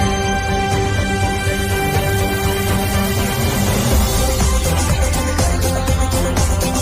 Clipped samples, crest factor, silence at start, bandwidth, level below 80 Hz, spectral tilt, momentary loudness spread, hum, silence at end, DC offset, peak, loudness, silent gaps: under 0.1%; 12 dB; 0 s; 16 kHz; -22 dBFS; -4.5 dB/octave; 2 LU; none; 0 s; under 0.1%; -4 dBFS; -17 LUFS; none